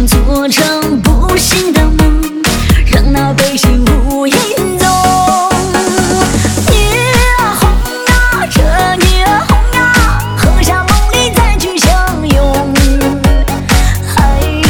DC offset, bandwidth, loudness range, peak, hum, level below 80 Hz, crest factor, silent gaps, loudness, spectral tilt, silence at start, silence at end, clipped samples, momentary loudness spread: under 0.1%; 19.5 kHz; 1 LU; 0 dBFS; none; -12 dBFS; 8 dB; none; -10 LUFS; -4.5 dB/octave; 0 s; 0 s; under 0.1%; 3 LU